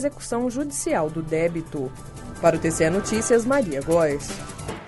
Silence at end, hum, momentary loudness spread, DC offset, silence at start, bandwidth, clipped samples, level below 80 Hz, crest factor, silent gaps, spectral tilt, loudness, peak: 0 s; none; 13 LU; under 0.1%; 0 s; 12 kHz; under 0.1%; -44 dBFS; 18 dB; none; -5 dB/octave; -23 LUFS; -6 dBFS